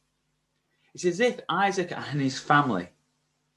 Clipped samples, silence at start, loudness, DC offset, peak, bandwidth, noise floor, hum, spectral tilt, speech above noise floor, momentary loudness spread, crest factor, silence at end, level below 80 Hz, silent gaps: under 0.1%; 0.95 s; -26 LUFS; under 0.1%; -6 dBFS; 12 kHz; -75 dBFS; none; -5 dB/octave; 50 dB; 9 LU; 22 dB; 0.7 s; -68 dBFS; none